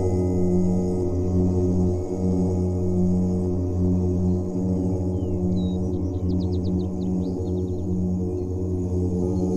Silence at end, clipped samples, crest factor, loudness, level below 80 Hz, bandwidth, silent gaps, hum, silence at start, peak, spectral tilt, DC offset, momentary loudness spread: 0 s; under 0.1%; 12 dB; -24 LUFS; -38 dBFS; 8.4 kHz; none; none; 0 s; -10 dBFS; -10 dB/octave; 0.1%; 4 LU